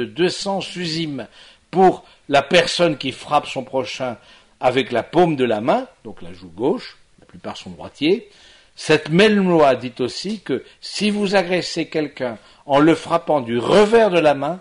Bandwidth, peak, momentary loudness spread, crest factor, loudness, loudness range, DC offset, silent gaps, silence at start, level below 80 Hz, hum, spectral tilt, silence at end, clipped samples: 11 kHz; 0 dBFS; 18 LU; 18 dB; -18 LUFS; 5 LU; under 0.1%; none; 0 s; -54 dBFS; none; -5 dB/octave; 0 s; under 0.1%